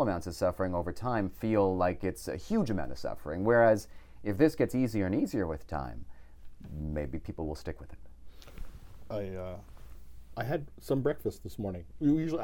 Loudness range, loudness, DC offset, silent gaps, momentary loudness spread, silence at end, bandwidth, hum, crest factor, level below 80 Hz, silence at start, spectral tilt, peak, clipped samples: 12 LU; -32 LUFS; under 0.1%; none; 18 LU; 0 s; 17.5 kHz; none; 22 dB; -48 dBFS; 0 s; -7.5 dB/octave; -10 dBFS; under 0.1%